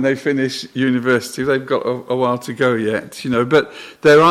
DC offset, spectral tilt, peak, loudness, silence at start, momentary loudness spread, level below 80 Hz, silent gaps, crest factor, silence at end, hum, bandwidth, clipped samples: under 0.1%; -5.5 dB/octave; -2 dBFS; -17 LUFS; 0 s; 6 LU; -56 dBFS; none; 14 dB; 0 s; none; 15 kHz; under 0.1%